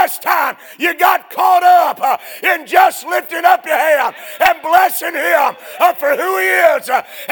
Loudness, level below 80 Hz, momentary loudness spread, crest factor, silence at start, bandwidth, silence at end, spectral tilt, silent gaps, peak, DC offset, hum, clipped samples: -13 LUFS; -60 dBFS; 7 LU; 14 dB; 0 s; over 20 kHz; 0 s; -1 dB/octave; none; 0 dBFS; under 0.1%; none; 0.1%